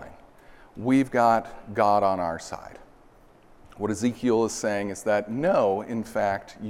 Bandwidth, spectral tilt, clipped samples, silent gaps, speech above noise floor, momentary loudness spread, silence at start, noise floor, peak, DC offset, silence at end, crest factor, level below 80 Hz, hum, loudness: 15 kHz; -5.5 dB/octave; under 0.1%; none; 29 dB; 12 LU; 0 s; -54 dBFS; -8 dBFS; under 0.1%; 0 s; 18 dB; -56 dBFS; none; -25 LUFS